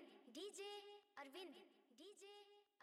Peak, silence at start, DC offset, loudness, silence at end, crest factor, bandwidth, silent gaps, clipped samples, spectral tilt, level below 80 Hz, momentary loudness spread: -44 dBFS; 0 s; under 0.1%; -58 LUFS; 0.2 s; 14 dB; 15.5 kHz; none; under 0.1%; -1 dB/octave; under -90 dBFS; 12 LU